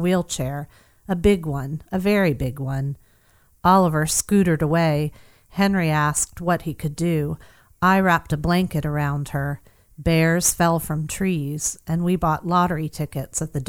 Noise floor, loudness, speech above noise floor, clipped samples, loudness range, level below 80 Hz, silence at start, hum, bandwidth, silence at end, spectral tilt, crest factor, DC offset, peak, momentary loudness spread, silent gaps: -58 dBFS; -21 LUFS; 37 dB; under 0.1%; 3 LU; -40 dBFS; 0 s; none; 18.5 kHz; 0.05 s; -5 dB/octave; 16 dB; under 0.1%; -4 dBFS; 11 LU; none